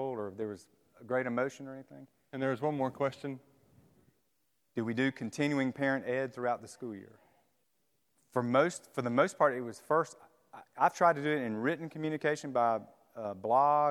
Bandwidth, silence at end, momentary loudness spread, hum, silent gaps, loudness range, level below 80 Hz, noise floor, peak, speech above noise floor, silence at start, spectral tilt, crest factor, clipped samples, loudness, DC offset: 14 kHz; 0 s; 16 LU; none; none; 6 LU; -82 dBFS; -79 dBFS; -12 dBFS; 47 dB; 0 s; -6 dB/octave; 22 dB; under 0.1%; -32 LUFS; under 0.1%